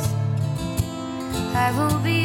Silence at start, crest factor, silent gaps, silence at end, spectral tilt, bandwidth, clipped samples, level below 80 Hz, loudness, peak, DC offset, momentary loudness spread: 0 s; 14 dB; none; 0 s; -5.5 dB/octave; 17 kHz; under 0.1%; -40 dBFS; -24 LUFS; -8 dBFS; under 0.1%; 7 LU